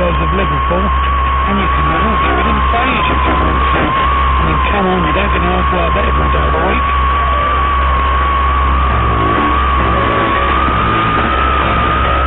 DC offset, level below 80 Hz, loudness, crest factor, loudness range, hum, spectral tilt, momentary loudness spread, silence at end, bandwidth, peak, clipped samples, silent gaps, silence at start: under 0.1%; -18 dBFS; -12 LUFS; 10 dB; 0 LU; none; -9 dB/octave; 1 LU; 0 s; 4 kHz; -2 dBFS; under 0.1%; none; 0 s